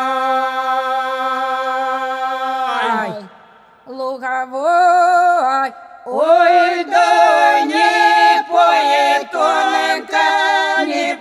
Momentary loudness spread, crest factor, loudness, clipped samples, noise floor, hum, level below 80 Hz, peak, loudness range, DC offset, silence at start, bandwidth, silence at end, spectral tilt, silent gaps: 10 LU; 14 dB; -14 LUFS; under 0.1%; -46 dBFS; none; -74 dBFS; -2 dBFS; 8 LU; under 0.1%; 0 s; 13.5 kHz; 0 s; -2 dB/octave; none